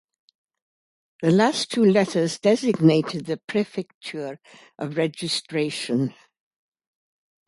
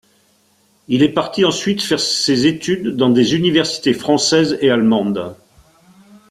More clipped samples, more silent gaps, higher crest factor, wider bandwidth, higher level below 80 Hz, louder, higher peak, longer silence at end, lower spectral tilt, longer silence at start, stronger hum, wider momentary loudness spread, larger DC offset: neither; first, 3.44-3.48 s, 3.94-4.01 s vs none; about the same, 20 dB vs 16 dB; second, 11.5 kHz vs 14 kHz; second, -68 dBFS vs -54 dBFS; second, -22 LUFS vs -15 LUFS; about the same, -4 dBFS vs -2 dBFS; first, 1.35 s vs 0.95 s; about the same, -5.5 dB/octave vs -4.5 dB/octave; first, 1.2 s vs 0.9 s; neither; first, 14 LU vs 6 LU; neither